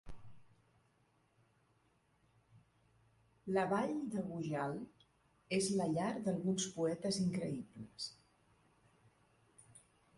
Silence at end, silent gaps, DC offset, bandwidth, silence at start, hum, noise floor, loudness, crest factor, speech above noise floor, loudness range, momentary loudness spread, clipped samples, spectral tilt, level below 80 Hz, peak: 0.4 s; none; under 0.1%; 11.5 kHz; 0.05 s; none; -75 dBFS; -39 LUFS; 20 dB; 37 dB; 5 LU; 11 LU; under 0.1%; -5 dB/octave; -70 dBFS; -22 dBFS